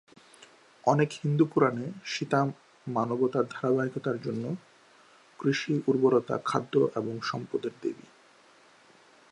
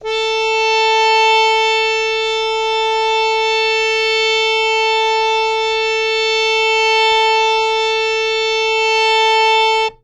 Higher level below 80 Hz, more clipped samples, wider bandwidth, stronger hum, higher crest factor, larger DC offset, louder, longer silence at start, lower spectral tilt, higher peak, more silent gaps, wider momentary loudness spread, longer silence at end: second, -76 dBFS vs -50 dBFS; neither; about the same, 11 kHz vs 11 kHz; neither; first, 20 dB vs 12 dB; neither; second, -29 LUFS vs -13 LUFS; first, 0.85 s vs 0 s; first, -6.5 dB/octave vs 1 dB/octave; second, -8 dBFS vs -4 dBFS; neither; first, 10 LU vs 4 LU; first, 1.4 s vs 0.1 s